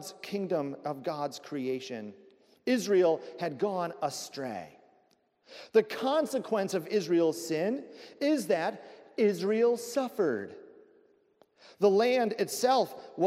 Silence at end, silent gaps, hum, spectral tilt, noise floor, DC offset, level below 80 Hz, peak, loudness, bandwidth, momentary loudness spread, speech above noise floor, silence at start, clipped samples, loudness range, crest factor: 0 s; none; none; -5 dB/octave; -69 dBFS; under 0.1%; -84 dBFS; -12 dBFS; -30 LUFS; 16 kHz; 12 LU; 40 dB; 0 s; under 0.1%; 3 LU; 18 dB